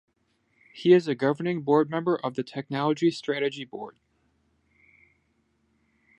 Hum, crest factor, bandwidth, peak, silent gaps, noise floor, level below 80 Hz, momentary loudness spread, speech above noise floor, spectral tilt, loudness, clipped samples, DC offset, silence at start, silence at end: none; 22 dB; 8.8 kHz; -6 dBFS; none; -70 dBFS; -76 dBFS; 15 LU; 45 dB; -7 dB/octave; -25 LUFS; under 0.1%; under 0.1%; 0.75 s; 2.3 s